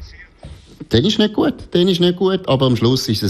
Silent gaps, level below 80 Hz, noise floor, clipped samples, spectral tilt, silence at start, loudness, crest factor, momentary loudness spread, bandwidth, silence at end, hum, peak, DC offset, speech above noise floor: none; -42 dBFS; -38 dBFS; under 0.1%; -6 dB/octave; 0 s; -16 LUFS; 14 dB; 4 LU; 13.5 kHz; 0 s; none; -2 dBFS; under 0.1%; 23 dB